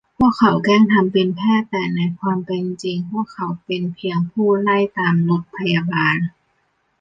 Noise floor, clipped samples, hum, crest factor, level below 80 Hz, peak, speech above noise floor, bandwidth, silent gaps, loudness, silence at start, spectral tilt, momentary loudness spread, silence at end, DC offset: -65 dBFS; under 0.1%; none; 16 dB; -54 dBFS; -2 dBFS; 48 dB; 7.6 kHz; none; -18 LUFS; 0.2 s; -7.5 dB/octave; 10 LU; 0.7 s; under 0.1%